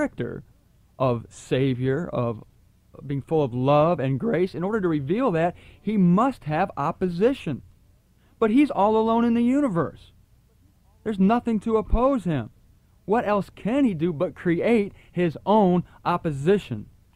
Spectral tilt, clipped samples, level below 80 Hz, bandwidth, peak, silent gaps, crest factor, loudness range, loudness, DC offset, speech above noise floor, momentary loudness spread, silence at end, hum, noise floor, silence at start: -8.5 dB/octave; under 0.1%; -42 dBFS; 11.5 kHz; -8 dBFS; none; 16 dB; 3 LU; -23 LUFS; under 0.1%; 36 dB; 12 LU; 0.3 s; none; -58 dBFS; 0 s